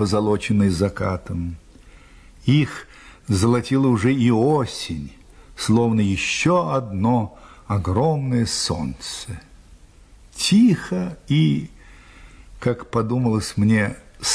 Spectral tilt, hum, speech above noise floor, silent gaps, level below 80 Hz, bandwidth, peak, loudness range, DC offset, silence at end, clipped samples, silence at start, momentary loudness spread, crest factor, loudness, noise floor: -5.5 dB/octave; none; 28 dB; none; -44 dBFS; 11 kHz; -6 dBFS; 3 LU; under 0.1%; 0 s; under 0.1%; 0 s; 13 LU; 14 dB; -20 LUFS; -48 dBFS